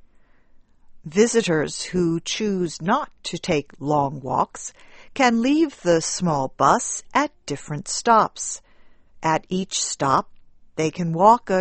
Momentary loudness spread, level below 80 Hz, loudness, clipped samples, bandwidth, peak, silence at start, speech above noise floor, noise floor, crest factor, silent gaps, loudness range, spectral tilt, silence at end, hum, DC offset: 12 LU; -52 dBFS; -22 LUFS; under 0.1%; 8.8 kHz; -2 dBFS; 0.9 s; 31 dB; -52 dBFS; 20 dB; none; 2 LU; -4.5 dB/octave; 0 s; none; under 0.1%